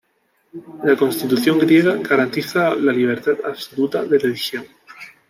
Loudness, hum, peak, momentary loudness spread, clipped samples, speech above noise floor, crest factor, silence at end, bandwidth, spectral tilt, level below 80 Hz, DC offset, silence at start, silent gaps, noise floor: -18 LUFS; none; -4 dBFS; 12 LU; under 0.1%; 47 dB; 16 dB; 0.2 s; 16 kHz; -5.5 dB/octave; -66 dBFS; under 0.1%; 0.55 s; none; -64 dBFS